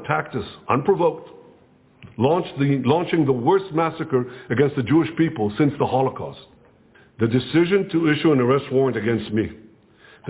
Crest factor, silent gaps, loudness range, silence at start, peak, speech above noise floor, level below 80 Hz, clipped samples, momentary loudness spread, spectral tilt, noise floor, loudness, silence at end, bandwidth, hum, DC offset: 18 dB; none; 2 LU; 0 s; -4 dBFS; 34 dB; -54 dBFS; under 0.1%; 7 LU; -11.5 dB/octave; -54 dBFS; -21 LUFS; 0 s; 4 kHz; none; under 0.1%